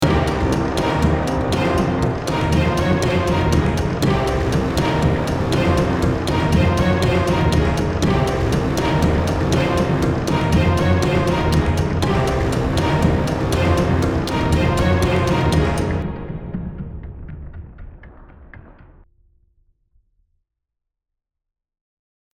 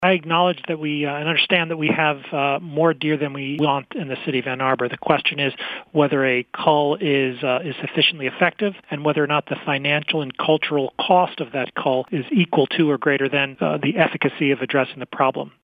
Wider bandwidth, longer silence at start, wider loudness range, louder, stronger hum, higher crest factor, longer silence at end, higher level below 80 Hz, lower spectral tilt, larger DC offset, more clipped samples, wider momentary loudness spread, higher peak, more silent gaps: first, 15.5 kHz vs 5 kHz; about the same, 0 s vs 0 s; first, 5 LU vs 2 LU; about the same, -18 LUFS vs -20 LUFS; neither; about the same, 16 dB vs 20 dB; first, 3.65 s vs 0.15 s; first, -28 dBFS vs -68 dBFS; second, -6.5 dB/octave vs -8.5 dB/octave; neither; neither; about the same, 5 LU vs 6 LU; second, -4 dBFS vs 0 dBFS; neither